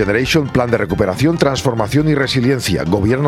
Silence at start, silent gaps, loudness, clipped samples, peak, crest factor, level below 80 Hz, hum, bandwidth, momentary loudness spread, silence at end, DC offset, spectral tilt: 0 s; none; -15 LUFS; under 0.1%; 0 dBFS; 14 dB; -36 dBFS; none; 15.5 kHz; 2 LU; 0 s; under 0.1%; -6 dB/octave